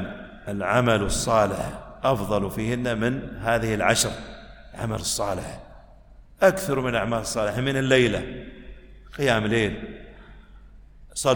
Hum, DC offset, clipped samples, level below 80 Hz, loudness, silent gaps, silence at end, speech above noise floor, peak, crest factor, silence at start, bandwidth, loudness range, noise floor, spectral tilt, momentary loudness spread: none; under 0.1%; under 0.1%; -42 dBFS; -24 LUFS; none; 0 s; 25 dB; -4 dBFS; 20 dB; 0 s; 18 kHz; 3 LU; -49 dBFS; -4.5 dB/octave; 18 LU